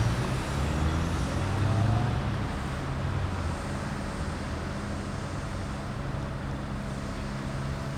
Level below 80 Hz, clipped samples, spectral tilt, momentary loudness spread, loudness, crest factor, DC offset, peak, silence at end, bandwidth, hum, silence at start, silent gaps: -38 dBFS; under 0.1%; -6 dB/octave; 7 LU; -31 LUFS; 16 dB; under 0.1%; -14 dBFS; 0 s; 14.5 kHz; none; 0 s; none